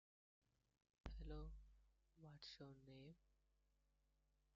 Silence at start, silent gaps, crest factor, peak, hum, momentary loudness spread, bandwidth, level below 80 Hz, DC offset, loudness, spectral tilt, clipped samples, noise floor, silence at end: 1.05 s; none; 24 dB; -38 dBFS; none; 10 LU; 7 kHz; -64 dBFS; under 0.1%; -61 LUFS; -5 dB/octave; under 0.1%; -84 dBFS; 1.2 s